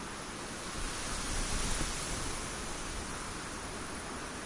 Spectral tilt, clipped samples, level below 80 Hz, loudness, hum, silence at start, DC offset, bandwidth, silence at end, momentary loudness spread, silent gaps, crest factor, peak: -2.5 dB/octave; under 0.1%; -44 dBFS; -38 LUFS; none; 0 s; under 0.1%; 11.5 kHz; 0 s; 6 LU; none; 16 dB; -20 dBFS